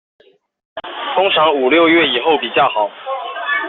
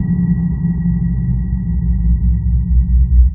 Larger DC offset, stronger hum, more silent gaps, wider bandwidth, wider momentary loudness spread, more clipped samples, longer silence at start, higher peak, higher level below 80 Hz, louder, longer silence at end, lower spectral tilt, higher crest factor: neither; neither; neither; first, 4.2 kHz vs 2.1 kHz; first, 15 LU vs 4 LU; neither; first, 0.75 s vs 0 s; about the same, -2 dBFS vs -2 dBFS; second, -60 dBFS vs -14 dBFS; about the same, -14 LUFS vs -16 LUFS; about the same, 0 s vs 0 s; second, -0.5 dB/octave vs -15 dB/octave; about the same, 14 dB vs 12 dB